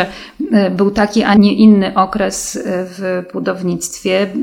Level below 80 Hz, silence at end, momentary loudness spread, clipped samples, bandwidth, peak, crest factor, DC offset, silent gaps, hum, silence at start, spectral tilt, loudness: -44 dBFS; 0 s; 11 LU; under 0.1%; 15 kHz; 0 dBFS; 14 dB; under 0.1%; none; none; 0 s; -5.5 dB/octave; -14 LUFS